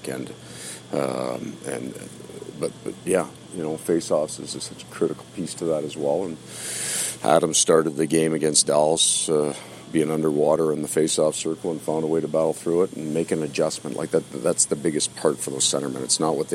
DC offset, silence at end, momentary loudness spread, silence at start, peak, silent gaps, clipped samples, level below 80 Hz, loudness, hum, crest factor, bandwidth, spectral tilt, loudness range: under 0.1%; 0 s; 14 LU; 0 s; -4 dBFS; none; under 0.1%; -64 dBFS; -23 LUFS; none; 20 dB; 16 kHz; -3.5 dB/octave; 8 LU